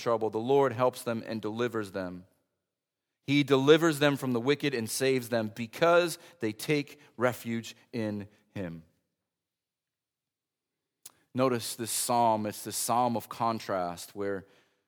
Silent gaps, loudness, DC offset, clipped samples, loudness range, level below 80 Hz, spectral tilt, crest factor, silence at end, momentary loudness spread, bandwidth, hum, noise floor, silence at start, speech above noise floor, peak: none; -29 LUFS; under 0.1%; under 0.1%; 12 LU; -76 dBFS; -4.5 dB/octave; 22 dB; 0.45 s; 15 LU; over 20 kHz; none; under -90 dBFS; 0 s; over 61 dB; -8 dBFS